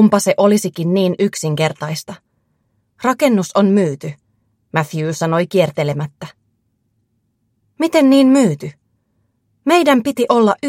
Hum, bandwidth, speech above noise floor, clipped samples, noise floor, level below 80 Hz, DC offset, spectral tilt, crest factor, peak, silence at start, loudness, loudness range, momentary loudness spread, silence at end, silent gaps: none; 16.5 kHz; 51 dB; under 0.1%; -66 dBFS; -62 dBFS; under 0.1%; -5.5 dB/octave; 16 dB; 0 dBFS; 0 s; -15 LUFS; 5 LU; 15 LU; 0 s; none